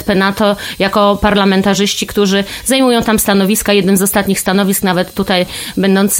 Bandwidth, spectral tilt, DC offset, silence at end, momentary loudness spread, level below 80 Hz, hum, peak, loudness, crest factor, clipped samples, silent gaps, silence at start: 17 kHz; -4 dB/octave; under 0.1%; 0 s; 4 LU; -36 dBFS; none; 0 dBFS; -12 LUFS; 12 dB; under 0.1%; none; 0 s